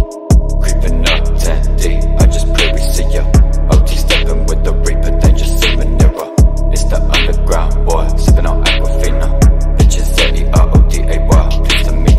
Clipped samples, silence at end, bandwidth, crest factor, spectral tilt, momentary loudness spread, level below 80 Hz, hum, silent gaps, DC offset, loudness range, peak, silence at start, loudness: under 0.1%; 0 s; 14 kHz; 8 dB; -5 dB/octave; 4 LU; -10 dBFS; none; none; under 0.1%; 1 LU; 0 dBFS; 0 s; -13 LUFS